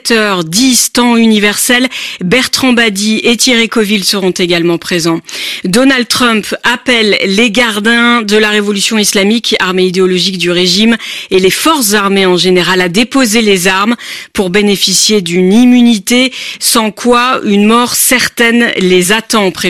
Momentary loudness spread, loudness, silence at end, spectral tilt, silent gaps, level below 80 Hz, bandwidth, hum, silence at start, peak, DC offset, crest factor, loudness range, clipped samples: 5 LU; -8 LUFS; 0 s; -3 dB/octave; none; -44 dBFS; 15.5 kHz; none; 0.05 s; 0 dBFS; 0.6%; 10 dB; 2 LU; under 0.1%